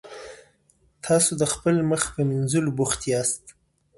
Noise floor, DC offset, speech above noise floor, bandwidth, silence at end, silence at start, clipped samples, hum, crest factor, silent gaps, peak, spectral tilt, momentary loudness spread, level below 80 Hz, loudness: -63 dBFS; under 0.1%; 40 dB; 12 kHz; 0.5 s; 0.05 s; under 0.1%; none; 18 dB; none; -8 dBFS; -4.5 dB/octave; 18 LU; -52 dBFS; -23 LUFS